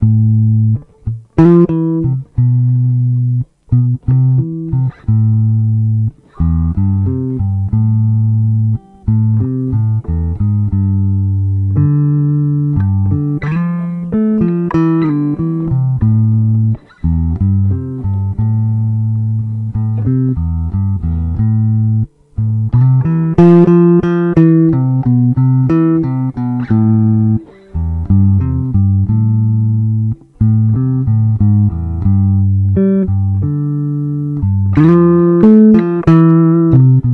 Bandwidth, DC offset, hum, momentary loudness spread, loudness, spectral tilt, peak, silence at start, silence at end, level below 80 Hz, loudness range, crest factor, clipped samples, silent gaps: 3.4 kHz; under 0.1%; none; 9 LU; -13 LUFS; -12 dB/octave; 0 dBFS; 0 s; 0 s; -32 dBFS; 5 LU; 12 dB; under 0.1%; none